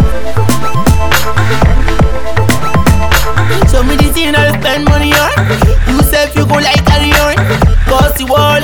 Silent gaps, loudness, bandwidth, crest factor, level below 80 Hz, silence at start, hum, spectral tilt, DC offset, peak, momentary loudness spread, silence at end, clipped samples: none; -10 LUFS; over 20 kHz; 10 dB; -14 dBFS; 0 s; none; -5 dB/octave; under 0.1%; 0 dBFS; 4 LU; 0 s; 0.6%